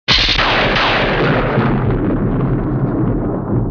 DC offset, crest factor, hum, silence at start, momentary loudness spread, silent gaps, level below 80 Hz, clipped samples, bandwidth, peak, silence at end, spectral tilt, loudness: under 0.1%; 14 dB; none; 0.1 s; 6 LU; none; -26 dBFS; under 0.1%; 5.4 kHz; 0 dBFS; 0 s; -6 dB/octave; -15 LUFS